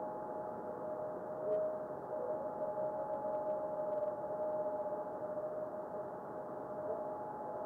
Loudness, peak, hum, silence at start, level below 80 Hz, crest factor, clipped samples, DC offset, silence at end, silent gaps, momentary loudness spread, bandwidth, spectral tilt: -41 LUFS; -26 dBFS; none; 0 s; -78 dBFS; 14 dB; under 0.1%; under 0.1%; 0 s; none; 5 LU; 2.6 kHz; -9 dB/octave